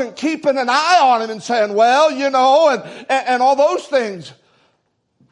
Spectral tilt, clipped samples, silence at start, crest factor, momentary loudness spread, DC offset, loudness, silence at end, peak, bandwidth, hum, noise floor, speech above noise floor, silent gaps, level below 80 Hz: -3 dB/octave; under 0.1%; 0 s; 14 dB; 8 LU; under 0.1%; -15 LUFS; 1 s; -2 dBFS; 10.5 kHz; none; -66 dBFS; 51 dB; none; -74 dBFS